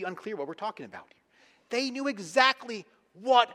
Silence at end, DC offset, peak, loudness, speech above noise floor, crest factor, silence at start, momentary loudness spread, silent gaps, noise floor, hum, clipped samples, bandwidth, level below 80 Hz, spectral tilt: 0 s; under 0.1%; -6 dBFS; -28 LUFS; 35 dB; 24 dB; 0 s; 19 LU; none; -63 dBFS; none; under 0.1%; 13 kHz; -84 dBFS; -2.5 dB/octave